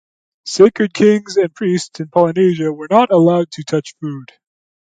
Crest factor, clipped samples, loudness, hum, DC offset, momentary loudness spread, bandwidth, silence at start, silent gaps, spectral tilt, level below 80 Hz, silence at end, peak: 14 dB; under 0.1%; -14 LUFS; none; under 0.1%; 15 LU; 9.2 kHz; 0.45 s; none; -6 dB/octave; -62 dBFS; 0.65 s; 0 dBFS